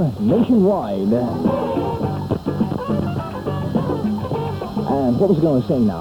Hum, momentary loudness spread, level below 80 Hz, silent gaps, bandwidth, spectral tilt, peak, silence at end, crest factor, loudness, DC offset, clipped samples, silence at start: none; 9 LU; -42 dBFS; none; 18 kHz; -9 dB/octave; -4 dBFS; 0 s; 14 dB; -20 LUFS; under 0.1%; under 0.1%; 0 s